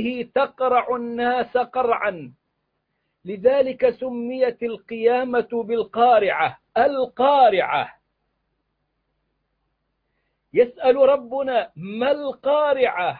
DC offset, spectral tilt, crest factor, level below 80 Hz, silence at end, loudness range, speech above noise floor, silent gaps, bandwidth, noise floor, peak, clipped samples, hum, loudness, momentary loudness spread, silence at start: under 0.1%; -8.5 dB/octave; 16 dB; -62 dBFS; 0 s; 4 LU; 54 dB; none; 4.8 kHz; -74 dBFS; -6 dBFS; under 0.1%; none; -20 LUFS; 10 LU; 0 s